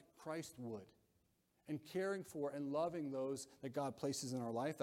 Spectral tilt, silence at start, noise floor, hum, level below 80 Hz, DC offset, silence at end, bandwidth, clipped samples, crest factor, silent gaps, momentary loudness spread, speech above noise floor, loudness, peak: -5 dB/octave; 0.15 s; -80 dBFS; none; -82 dBFS; under 0.1%; 0 s; 16.5 kHz; under 0.1%; 16 dB; none; 8 LU; 36 dB; -45 LUFS; -28 dBFS